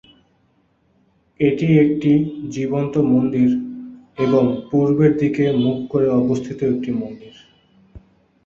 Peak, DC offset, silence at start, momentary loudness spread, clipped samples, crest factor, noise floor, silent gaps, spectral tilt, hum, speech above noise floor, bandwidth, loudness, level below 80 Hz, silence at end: -4 dBFS; under 0.1%; 1.4 s; 10 LU; under 0.1%; 16 dB; -61 dBFS; none; -8.5 dB/octave; none; 44 dB; 7.4 kHz; -18 LUFS; -52 dBFS; 0.5 s